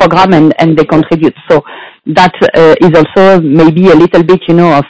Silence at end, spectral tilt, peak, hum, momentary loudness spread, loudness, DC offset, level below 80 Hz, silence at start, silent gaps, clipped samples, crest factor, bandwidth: 0.05 s; -7.5 dB/octave; 0 dBFS; none; 6 LU; -6 LUFS; under 0.1%; -38 dBFS; 0 s; none; 20%; 6 dB; 8 kHz